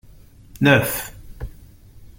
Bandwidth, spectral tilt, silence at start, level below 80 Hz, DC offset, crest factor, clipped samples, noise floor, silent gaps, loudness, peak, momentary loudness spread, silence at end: 17 kHz; -5 dB/octave; 0.55 s; -42 dBFS; under 0.1%; 22 dB; under 0.1%; -46 dBFS; none; -18 LUFS; -2 dBFS; 22 LU; 0.1 s